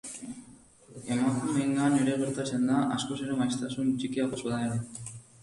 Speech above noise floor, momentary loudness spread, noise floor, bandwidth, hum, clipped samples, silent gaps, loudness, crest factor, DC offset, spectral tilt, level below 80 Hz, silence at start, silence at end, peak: 25 dB; 15 LU; -54 dBFS; 11.5 kHz; none; under 0.1%; none; -29 LUFS; 14 dB; under 0.1%; -5.5 dB/octave; -64 dBFS; 0.05 s; 0.2 s; -14 dBFS